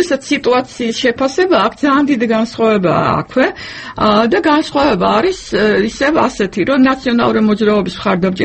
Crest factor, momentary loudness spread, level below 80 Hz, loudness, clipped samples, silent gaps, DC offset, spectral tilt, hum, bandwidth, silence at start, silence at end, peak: 12 dB; 4 LU; -42 dBFS; -13 LUFS; under 0.1%; none; under 0.1%; -5.5 dB/octave; none; 8.8 kHz; 0 s; 0 s; 0 dBFS